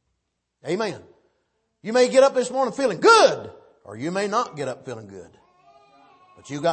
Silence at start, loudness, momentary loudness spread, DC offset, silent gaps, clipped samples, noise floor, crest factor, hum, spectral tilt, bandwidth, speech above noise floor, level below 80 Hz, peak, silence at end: 0.65 s; -20 LUFS; 23 LU; under 0.1%; none; under 0.1%; -77 dBFS; 20 dB; none; -3.5 dB/octave; 8.8 kHz; 56 dB; -70 dBFS; -2 dBFS; 0 s